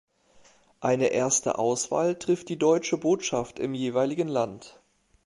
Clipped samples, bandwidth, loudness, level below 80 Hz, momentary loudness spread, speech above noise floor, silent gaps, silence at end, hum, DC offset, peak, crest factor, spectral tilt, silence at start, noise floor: under 0.1%; 11.5 kHz; -26 LUFS; -64 dBFS; 6 LU; 33 dB; none; 0.55 s; none; under 0.1%; -10 dBFS; 18 dB; -4 dB/octave; 0.8 s; -58 dBFS